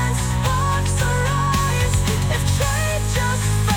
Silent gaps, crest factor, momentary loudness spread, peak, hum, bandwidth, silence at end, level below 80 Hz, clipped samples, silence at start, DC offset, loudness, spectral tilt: none; 12 dB; 2 LU; -6 dBFS; none; 18.5 kHz; 0 s; -26 dBFS; under 0.1%; 0 s; under 0.1%; -20 LUFS; -4.5 dB/octave